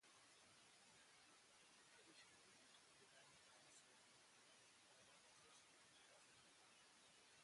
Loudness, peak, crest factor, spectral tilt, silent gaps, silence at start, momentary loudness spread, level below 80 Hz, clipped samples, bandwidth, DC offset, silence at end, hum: -69 LUFS; -56 dBFS; 16 dB; -1 dB/octave; none; 0 s; 2 LU; under -90 dBFS; under 0.1%; 11.5 kHz; under 0.1%; 0 s; none